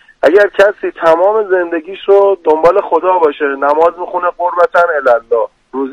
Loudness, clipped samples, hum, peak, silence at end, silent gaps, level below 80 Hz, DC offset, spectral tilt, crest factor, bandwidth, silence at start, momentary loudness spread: -11 LUFS; 1%; none; 0 dBFS; 0 s; none; -50 dBFS; under 0.1%; -5 dB/octave; 12 dB; 10 kHz; 0.25 s; 7 LU